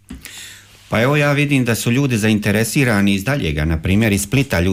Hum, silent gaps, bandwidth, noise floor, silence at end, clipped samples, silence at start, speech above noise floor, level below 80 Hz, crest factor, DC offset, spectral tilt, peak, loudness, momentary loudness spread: none; none; 16 kHz; -39 dBFS; 0 s; under 0.1%; 0.1 s; 24 dB; -34 dBFS; 12 dB; under 0.1%; -5.5 dB/octave; -6 dBFS; -16 LUFS; 15 LU